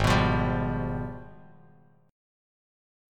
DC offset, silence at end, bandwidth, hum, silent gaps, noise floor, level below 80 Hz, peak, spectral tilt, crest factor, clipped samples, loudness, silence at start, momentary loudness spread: under 0.1%; 0.95 s; 16 kHz; none; none; -58 dBFS; -40 dBFS; -10 dBFS; -6.5 dB/octave; 20 dB; under 0.1%; -28 LUFS; 0 s; 15 LU